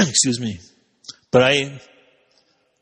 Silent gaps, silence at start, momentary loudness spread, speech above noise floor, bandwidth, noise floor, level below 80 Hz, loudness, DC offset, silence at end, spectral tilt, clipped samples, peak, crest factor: none; 0 s; 24 LU; 43 dB; 10.5 kHz; -62 dBFS; -56 dBFS; -18 LUFS; under 0.1%; 1.05 s; -3 dB/octave; under 0.1%; -2 dBFS; 20 dB